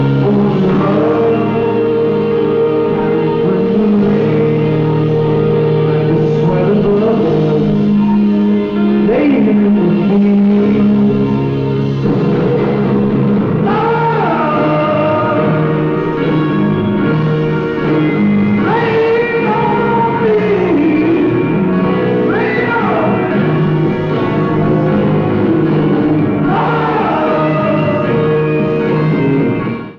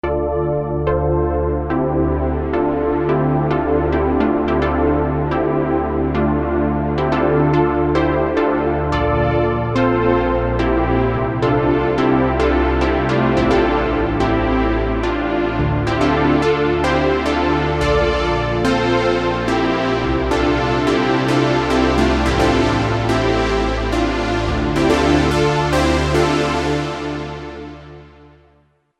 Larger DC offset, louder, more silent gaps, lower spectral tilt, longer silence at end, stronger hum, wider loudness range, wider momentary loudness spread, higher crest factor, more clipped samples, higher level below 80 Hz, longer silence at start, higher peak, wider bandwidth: neither; first, -12 LUFS vs -17 LUFS; neither; first, -10 dB/octave vs -6.5 dB/octave; second, 0 s vs 0.9 s; neither; about the same, 2 LU vs 2 LU; about the same, 3 LU vs 4 LU; about the same, 10 dB vs 14 dB; neither; second, -40 dBFS vs -28 dBFS; about the same, 0 s vs 0.05 s; about the same, -2 dBFS vs -2 dBFS; second, 5.8 kHz vs 12 kHz